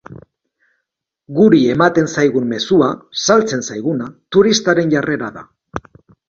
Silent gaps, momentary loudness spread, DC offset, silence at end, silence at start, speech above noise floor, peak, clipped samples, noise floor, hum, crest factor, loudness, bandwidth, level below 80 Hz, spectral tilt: none; 14 LU; under 0.1%; 0.5 s; 0.1 s; 61 dB; 0 dBFS; under 0.1%; -76 dBFS; none; 16 dB; -15 LUFS; 7.6 kHz; -52 dBFS; -5 dB/octave